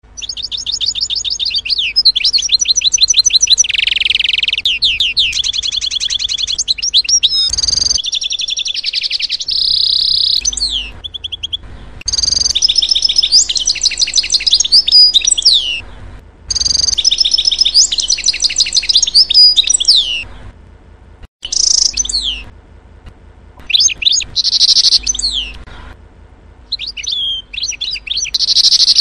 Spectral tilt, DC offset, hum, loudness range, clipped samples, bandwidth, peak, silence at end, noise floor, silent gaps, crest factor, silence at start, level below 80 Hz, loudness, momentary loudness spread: 2.5 dB/octave; under 0.1%; none; 5 LU; under 0.1%; 16 kHz; 0 dBFS; 0 s; -40 dBFS; 21.28-21.40 s; 14 dB; 0.15 s; -36 dBFS; -10 LUFS; 12 LU